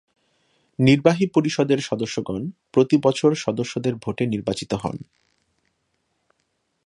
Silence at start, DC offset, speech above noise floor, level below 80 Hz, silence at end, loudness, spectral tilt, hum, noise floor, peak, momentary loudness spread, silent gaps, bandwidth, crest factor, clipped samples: 0.8 s; under 0.1%; 51 dB; -56 dBFS; 1.85 s; -21 LUFS; -6 dB/octave; none; -72 dBFS; 0 dBFS; 11 LU; none; 11 kHz; 22 dB; under 0.1%